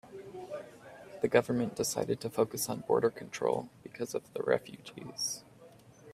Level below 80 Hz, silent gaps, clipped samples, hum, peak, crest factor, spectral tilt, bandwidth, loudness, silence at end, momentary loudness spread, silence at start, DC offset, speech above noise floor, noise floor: -70 dBFS; none; under 0.1%; none; -10 dBFS; 24 dB; -4 dB/octave; 15.5 kHz; -33 LUFS; 0 s; 18 LU; 0.05 s; under 0.1%; 24 dB; -57 dBFS